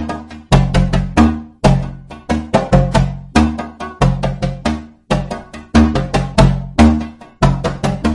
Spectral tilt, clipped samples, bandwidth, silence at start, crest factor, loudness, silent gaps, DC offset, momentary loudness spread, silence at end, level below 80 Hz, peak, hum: -7 dB/octave; under 0.1%; 11.5 kHz; 0 s; 14 dB; -15 LUFS; none; under 0.1%; 13 LU; 0 s; -22 dBFS; 0 dBFS; none